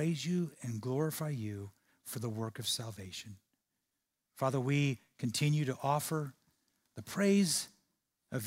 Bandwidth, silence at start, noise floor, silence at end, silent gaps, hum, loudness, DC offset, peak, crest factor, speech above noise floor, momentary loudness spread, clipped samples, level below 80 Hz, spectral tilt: 16 kHz; 0 s; -86 dBFS; 0 s; none; none; -35 LUFS; under 0.1%; -18 dBFS; 18 dB; 52 dB; 16 LU; under 0.1%; -76 dBFS; -5 dB/octave